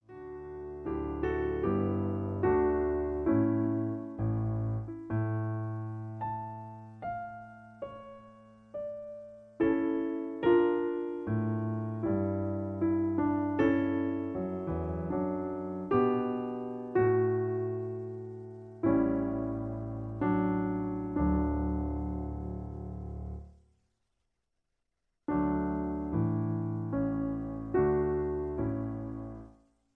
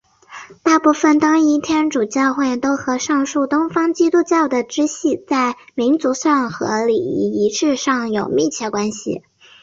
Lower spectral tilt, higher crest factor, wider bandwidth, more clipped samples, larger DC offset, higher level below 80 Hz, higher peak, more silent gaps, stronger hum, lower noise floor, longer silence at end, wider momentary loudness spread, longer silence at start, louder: first, -11 dB/octave vs -4 dB/octave; about the same, 18 dB vs 14 dB; second, 4 kHz vs 7.8 kHz; neither; neither; first, -48 dBFS vs -58 dBFS; second, -14 dBFS vs -2 dBFS; neither; neither; first, -83 dBFS vs -39 dBFS; about the same, 0.45 s vs 0.45 s; first, 15 LU vs 7 LU; second, 0.1 s vs 0.3 s; second, -32 LUFS vs -17 LUFS